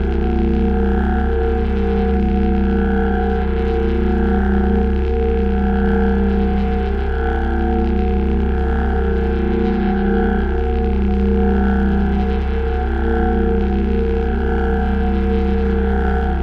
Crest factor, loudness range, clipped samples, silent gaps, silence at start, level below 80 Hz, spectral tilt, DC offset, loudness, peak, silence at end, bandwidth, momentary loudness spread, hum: 10 dB; 1 LU; under 0.1%; none; 0 s; -18 dBFS; -10 dB/octave; under 0.1%; -18 LUFS; -6 dBFS; 0 s; 4.9 kHz; 3 LU; none